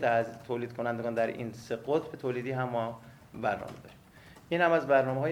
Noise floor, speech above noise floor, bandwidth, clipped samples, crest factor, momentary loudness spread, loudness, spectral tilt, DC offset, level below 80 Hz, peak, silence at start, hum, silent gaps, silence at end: -54 dBFS; 24 dB; 16 kHz; under 0.1%; 20 dB; 13 LU; -31 LUFS; -7 dB/octave; under 0.1%; -66 dBFS; -12 dBFS; 0 s; none; none; 0 s